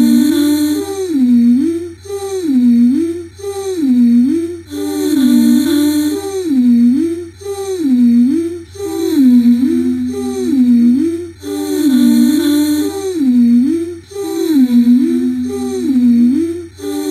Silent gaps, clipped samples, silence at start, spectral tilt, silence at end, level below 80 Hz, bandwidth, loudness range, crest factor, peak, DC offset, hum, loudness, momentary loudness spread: none; under 0.1%; 0 s; -5 dB/octave; 0 s; -52 dBFS; 15 kHz; 2 LU; 10 dB; -2 dBFS; under 0.1%; none; -13 LUFS; 13 LU